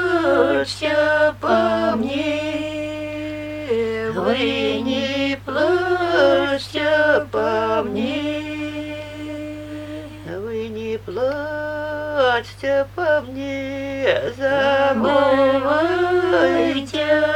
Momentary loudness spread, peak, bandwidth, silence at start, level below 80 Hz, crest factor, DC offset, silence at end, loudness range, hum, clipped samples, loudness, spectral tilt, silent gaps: 12 LU; -2 dBFS; 16 kHz; 0 s; -48 dBFS; 16 dB; under 0.1%; 0 s; 9 LU; 50 Hz at -40 dBFS; under 0.1%; -20 LUFS; -5.5 dB/octave; none